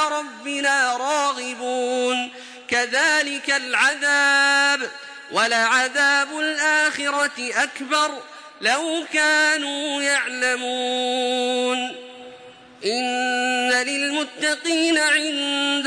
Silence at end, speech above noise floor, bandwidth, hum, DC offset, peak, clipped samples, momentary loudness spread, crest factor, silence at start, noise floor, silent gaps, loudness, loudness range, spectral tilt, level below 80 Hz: 0 s; 23 dB; 10.5 kHz; none; under 0.1%; -6 dBFS; under 0.1%; 9 LU; 16 dB; 0 s; -44 dBFS; none; -20 LUFS; 5 LU; 0 dB/octave; -74 dBFS